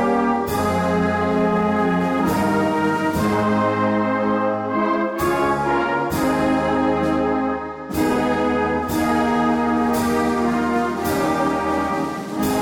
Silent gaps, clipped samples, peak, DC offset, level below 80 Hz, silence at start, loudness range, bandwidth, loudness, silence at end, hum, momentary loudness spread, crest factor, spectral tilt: none; under 0.1%; -10 dBFS; under 0.1%; -42 dBFS; 0 s; 1 LU; 17 kHz; -20 LUFS; 0 s; none; 3 LU; 10 dB; -6 dB/octave